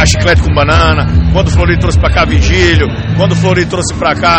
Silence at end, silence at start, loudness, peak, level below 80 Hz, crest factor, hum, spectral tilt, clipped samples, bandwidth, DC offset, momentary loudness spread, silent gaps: 0 s; 0 s; -9 LUFS; 0 dBFS; -14 dBFS; 8 dB; none; -5 dB/octave; under 0.1%; 8.8 kHz; under 0.1%; 4 LU; none